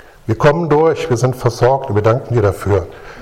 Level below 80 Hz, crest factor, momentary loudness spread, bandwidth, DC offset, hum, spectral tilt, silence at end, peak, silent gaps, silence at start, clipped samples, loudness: -38 dBFS; 14 dB; 5 LU; 15.5 kHz; under 0.1%; none; -7 dB/octave; 0 s; 0 dBFS; none; 0.25 s; under 0.1%; -15 LUFS